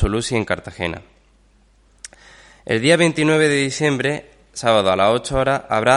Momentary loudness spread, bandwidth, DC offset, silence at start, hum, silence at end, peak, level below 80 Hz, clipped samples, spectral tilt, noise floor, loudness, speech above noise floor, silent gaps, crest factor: 20 LU; 11.5 kHz; under 0.1%; 0 s; none; 0 s; 0 dBFS; -36 dBFS; under 0.1%; -4.5 dB/octave; -55 dBFS; -18 LUFS; 37 dB; none; 18 dB